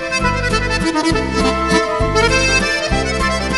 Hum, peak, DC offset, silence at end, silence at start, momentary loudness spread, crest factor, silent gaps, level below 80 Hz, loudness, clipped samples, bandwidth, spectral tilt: none; 0 dBFS; 0.5%; 0 s; 0 s; 4 LU; 16 dB; none; -26 dBFS; -15 LUFS; under 0.1%; 11.5 kHz; -4 dB/octave